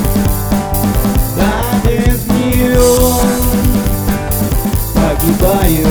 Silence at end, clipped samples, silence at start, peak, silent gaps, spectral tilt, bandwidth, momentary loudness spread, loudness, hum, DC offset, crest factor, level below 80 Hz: 0 s; under 0.1%; 0 s; 0 dBFS; none; -5.5 dB/octave; over 20 kHz; 5 LU; -13 LUFS; none; under 0.1%; 12 dB; -18 dBFS